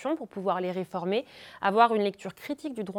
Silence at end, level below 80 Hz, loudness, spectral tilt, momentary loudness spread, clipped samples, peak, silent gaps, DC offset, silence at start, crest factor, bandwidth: 0 s; -74 dBFS; -28 LUFS; -6 dB/octave; 14 LU; under 0.1%; -8 dBFS; none; under 0.1%; 0 s; 20 dB; 18 kHz